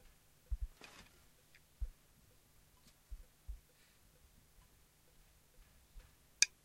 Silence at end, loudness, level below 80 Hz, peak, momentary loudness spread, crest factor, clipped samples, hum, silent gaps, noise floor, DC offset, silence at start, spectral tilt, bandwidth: 0.15 s; -44 LUFS; -54 dBFS; -6 dBFS; 19 LU; 42 dB; under 0.1%; none; none; -69 dBFS; under 0.1%; 0.5 s; 0.5 dB/octave; 16 kHz